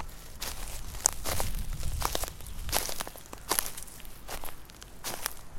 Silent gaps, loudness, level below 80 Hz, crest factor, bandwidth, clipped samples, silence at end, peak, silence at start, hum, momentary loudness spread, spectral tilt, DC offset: none; -34 LUFS; -40 dBFS; 34 dB; 17 kHz; under 0.1%; 0 s; 0 dBFS; 0 s; none; 16 LU; -2 dB/octave; under 0.1%